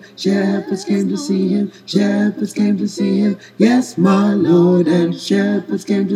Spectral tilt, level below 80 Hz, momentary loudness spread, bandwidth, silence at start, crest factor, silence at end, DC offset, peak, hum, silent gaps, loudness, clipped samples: -6.5 dB/octave; -68 dBFS; 7 LU; 12 kHz; 0.05 s; 14 dB; 0 s; under 0.1%; 0 dBFS; none; none; -16 LUFS; under 0.1%